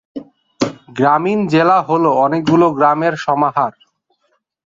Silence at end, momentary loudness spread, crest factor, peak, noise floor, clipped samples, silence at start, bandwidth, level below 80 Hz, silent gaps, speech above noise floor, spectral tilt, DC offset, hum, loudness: 1 s; 10 LU; 14 dB; 0 dBFS; -65 dBFS; under 0.1%; 0.15 s; 7.8 kHz; -60 dBFS; none; 52 dB; -7 dB/octave; under 0.1%; none; -14 LUFS